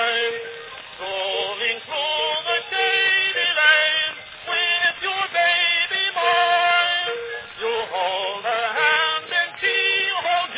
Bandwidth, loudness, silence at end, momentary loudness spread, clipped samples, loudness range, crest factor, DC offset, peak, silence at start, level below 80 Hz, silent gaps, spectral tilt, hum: 4 kHz; -19 LUFS; 0 s; 10 LU; under 0.1%; 3 LU; 18 dB; under 0.1%; -4 dBFS; 0 s; -66 dBFS; none; -4 dB/octave; none